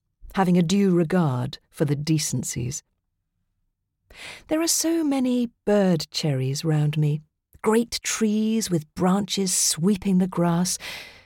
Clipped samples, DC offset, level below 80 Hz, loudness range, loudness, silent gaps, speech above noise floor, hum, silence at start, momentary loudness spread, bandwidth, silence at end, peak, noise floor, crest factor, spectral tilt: under 0.1%; under 0.1%; -54 dBFS; 4 LU; -23 LUFS; none; 53 dB; none; 0.25 s; 10 LU; 17 kHz; 0.15 s; -8 dBFS; -76 dBFS; 16 dB; -5 dB/octave